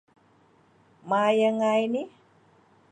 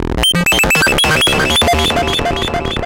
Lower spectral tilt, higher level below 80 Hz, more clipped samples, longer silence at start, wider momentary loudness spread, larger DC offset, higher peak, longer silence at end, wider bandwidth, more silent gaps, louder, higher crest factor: first, -5.5 dB/octave vs -3 dB/octave; second, -80 dBFS vs -26 dBFS; neither; first, 1.05 s vs 0 s; first, 10 LU vs 6 LU; second, under 0.1% vs 0.7%; second, -10 dBFS vs -4 dBFS; first, 0.85 s vs 0 s; second, 9.2 kHz vs 17 kHz; neither; second, -24 LUFS vs -11 LUFS; first, 18 dB vs 8 dB